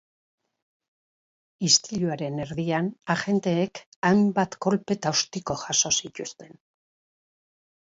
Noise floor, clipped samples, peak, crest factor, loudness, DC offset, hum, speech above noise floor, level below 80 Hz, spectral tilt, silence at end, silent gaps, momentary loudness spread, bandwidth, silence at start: under -90 dBFS; under 0.1%; -4 dBFS; 22 dB; -24 LUFS; under 0.1%; none; over 65 dB; -62 dBFS; -3.5 dB/octave; 1.5 s; 3.86-4.02 s; 11 LU; 8 kHz; 1.6 s